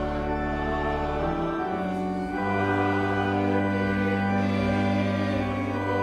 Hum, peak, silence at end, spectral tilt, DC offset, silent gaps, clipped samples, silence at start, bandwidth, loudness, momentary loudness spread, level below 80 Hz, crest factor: none; -12 dBFS; 0 s; -7.5 dB/octave; under 0.1%; none; under 0.1%; 0 s; 10 kHz; -26 LUFS; 4 LU; -40 dBFS; 14 dB